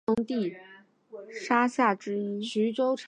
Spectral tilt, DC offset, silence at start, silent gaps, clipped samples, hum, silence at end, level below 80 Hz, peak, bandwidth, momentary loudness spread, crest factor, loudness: -5.5 dB/octave; under 0.1%; 0.1 s; none; under 0.1%; none; 0 s; -70 dBFS; -8 dBFS; 9.8 kHz; 20 LU; 20 dB; -28 LUFS